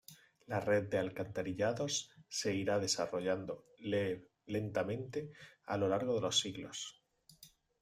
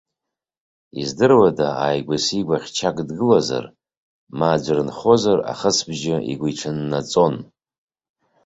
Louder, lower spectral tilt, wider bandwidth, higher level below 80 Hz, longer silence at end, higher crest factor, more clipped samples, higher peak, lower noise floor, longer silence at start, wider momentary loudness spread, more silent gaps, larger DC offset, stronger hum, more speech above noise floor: second, -37 LUFS vs -19 LUFS; about the same, -4 dB/octave vs -5 dB/octave; first, 15.5 kHz vs 8.2 kHz; second, -72 dBFS vs -56 dBFS; second, 0.35 s vs 1 s; about the same, 18 dB vs 18 dB; neither; second, -20 dBFS vs -2 dBFS; second, -63 dBFS vs -85 dBFS; second, 0.1 s vs 0.95 s; about the same, 11 LU vs 10 LU; second, none vs 3.97-4.27 s; neither; neither; second, 27 dB vs 66 dB